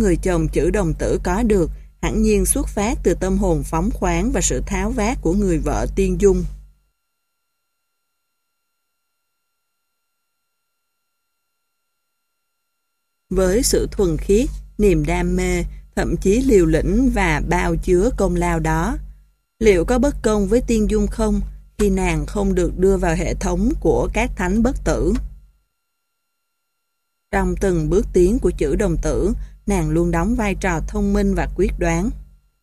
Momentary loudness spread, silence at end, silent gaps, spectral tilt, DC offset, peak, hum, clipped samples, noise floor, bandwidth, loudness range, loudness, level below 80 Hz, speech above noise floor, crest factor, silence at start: 6 LU; 0.4 s; none; -6 dB/octave; under 0.1%; -2 dBFS; none; under 0.1%; -75 dBFS; 14.5 kHz; 6 LU; -19 LUFS; -26 dBFS; 58 dB; 18 dB; 0 s